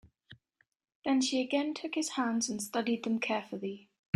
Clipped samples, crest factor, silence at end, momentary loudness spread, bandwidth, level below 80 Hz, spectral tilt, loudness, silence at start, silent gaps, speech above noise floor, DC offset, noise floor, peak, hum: under 0.1%; 20 dB; 0.4 s; 10 LU; 15.5 kHz; -76 dBFS; -3 dB/octave; -33 LUFS; 0.3 s; 0.95-1.02 s; 40 dB; under 0.1%; -73 dBFS; -12 dBFS; none